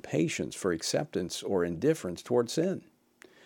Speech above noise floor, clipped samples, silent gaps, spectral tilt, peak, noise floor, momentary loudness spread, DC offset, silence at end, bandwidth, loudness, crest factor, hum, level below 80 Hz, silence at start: 29 dB; under 0.1%; none; -5 dB/octave; -14 dBFS; -59 dBFS; 5 LU; under 0.1%; 0.65 s; 18 kHz; -31 LUFS; 18 dB; none; -68 dBFS; 0.05 s